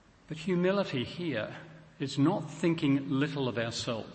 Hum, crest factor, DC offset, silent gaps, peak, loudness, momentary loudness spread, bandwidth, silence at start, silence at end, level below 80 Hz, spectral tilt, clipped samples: none; 16 dB; under 0.1%; none; -14 dBFS; -31 LUFS; 11 LU; 8.6 kHz; 0.3 s; 0 s; -66 dBFS; -6 dB/octave; under 0.1%